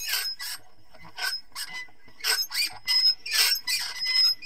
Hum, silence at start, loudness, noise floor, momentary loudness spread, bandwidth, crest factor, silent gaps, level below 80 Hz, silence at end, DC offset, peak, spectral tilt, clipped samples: none; 0 s; -24 LUFS; -53 dBFS; 16 LU; 16 kHz; 20 dB; none; -66 dBFS; 0 s; 0.7%; -8 dBFS; 3 dB/octave; under 0.1%